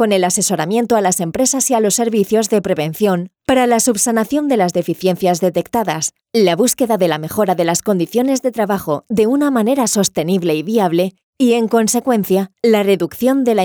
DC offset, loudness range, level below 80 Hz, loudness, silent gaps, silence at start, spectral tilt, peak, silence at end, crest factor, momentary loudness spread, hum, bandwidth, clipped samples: under 0.1%; 1 LU; -54 dBFS; -15 LUFS; 11.23-11.33 s; 0 s; -4.5 dB/octave; -4 dBFS; 0 s; 12 dB; 4 LU; none; over 20 kHz; under 0.1%